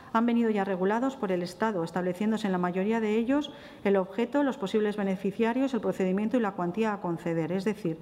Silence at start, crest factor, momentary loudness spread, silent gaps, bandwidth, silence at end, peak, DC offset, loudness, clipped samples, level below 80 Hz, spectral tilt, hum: 0 s; 16 dB; 4 LU; none; 13.5 kHz; 0 s; -12 dBFS; under 0.1%; -29 LUFS; under 0.1%; -66 dBFS; -7 dB/octave; none